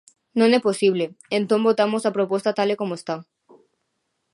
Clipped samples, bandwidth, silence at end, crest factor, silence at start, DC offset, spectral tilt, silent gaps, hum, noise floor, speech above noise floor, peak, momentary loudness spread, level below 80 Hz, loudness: under 0.1%; 11.5 kHz; 1.1 s; 18 dB; 0.35 s; under 0.1%; -5.5 dB/octave; none; none; -75 dBFS; 54 dB; -4 dBFS; 10 LU; -74 dBFS; -21 LUFS